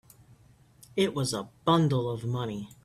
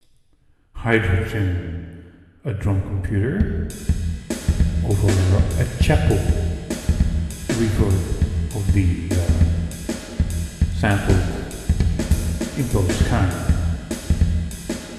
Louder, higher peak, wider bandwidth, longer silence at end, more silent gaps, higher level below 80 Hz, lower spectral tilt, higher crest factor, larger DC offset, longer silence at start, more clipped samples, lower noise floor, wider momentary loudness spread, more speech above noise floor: second, -29 LUFS vs -21 LUFS; second, -10 dBFS vs -2 dBFS; first, 14.5 kHz vs 13 kHz; about the same, 0.1 s vs 0 s; neither; second, -62 dBFS vs -26 dBFS; about the same, -6 dB/octave vs -6.5 dB/octave; about the same, 20 dB vs 18 dB; neither; first, 0.95 s vs 0.75 s; neither; about the same, -58 dBFS vs -57 dBFS; about the same, 10 LU vs 9 LU; second, 30 dB vs 38 dB